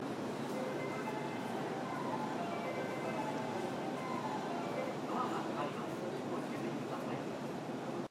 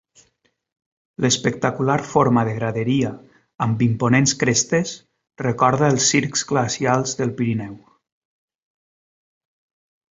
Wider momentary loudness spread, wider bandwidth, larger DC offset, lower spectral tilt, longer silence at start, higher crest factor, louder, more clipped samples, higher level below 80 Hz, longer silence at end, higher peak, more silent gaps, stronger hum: second, 3 LU vs 9 LU; first, 16 kHz vs 8 kHz; neither; about the same, -5.5 dB/octave vs -4.5 dB/octave; second, 0 s vs 1.2 s; second, 14 dB vs 20 dB; second, -40 LUFS vs -20 LUFS; neither; second, -78 dBFS vs -54 dBFS; second, 0.05 s vs 2.35 s; second, -24 dBFS vs -2 dBFS; neither; neither